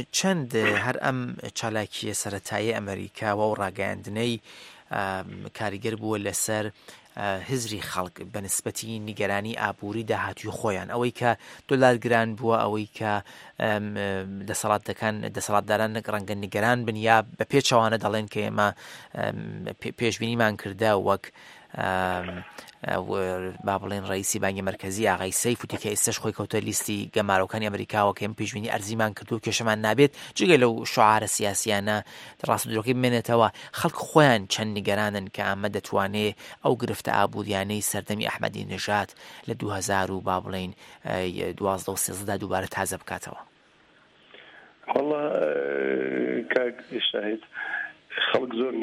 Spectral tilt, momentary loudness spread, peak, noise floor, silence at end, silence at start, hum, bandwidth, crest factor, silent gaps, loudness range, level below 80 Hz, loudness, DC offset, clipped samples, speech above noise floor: -4 dB/octave; 11 LU; -2 dBFS; -59 dBFS; 0 s; 0 s; none; 16 kHz; 24 dB; none; 6 LU; -64 dBFS; -26 LUFS; under 0.1%; under 0.1%; 32 dB